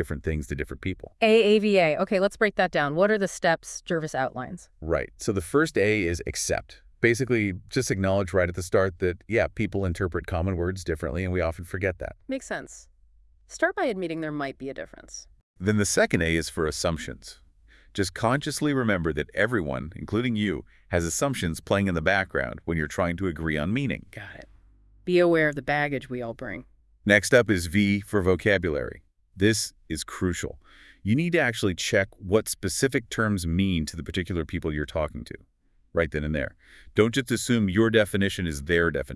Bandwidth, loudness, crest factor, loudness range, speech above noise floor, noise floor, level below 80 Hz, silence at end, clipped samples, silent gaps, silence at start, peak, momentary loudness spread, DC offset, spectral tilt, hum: 12 kHz; -26 LUFS; 22 dB; 6 LU; 32 dB; -58 dBFS; -46 dBFS; 0 s; under 0.1%; 15.43-15.54 s; 0 s; -4 dBFS; 13 LU; under 0.1%; -5 dB/octave; none